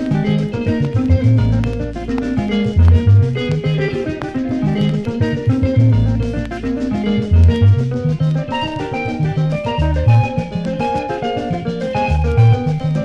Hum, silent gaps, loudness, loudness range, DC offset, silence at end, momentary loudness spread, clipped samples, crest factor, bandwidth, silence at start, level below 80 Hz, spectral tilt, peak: none; none; -16 LUFS; 2 LU; under 0.1%; 0 s; 9 LU; under 0.1%; 12 dB; 7.8 kHz; 0 s; -24 dBFS; -8.5 dB/octave; -2 dBFS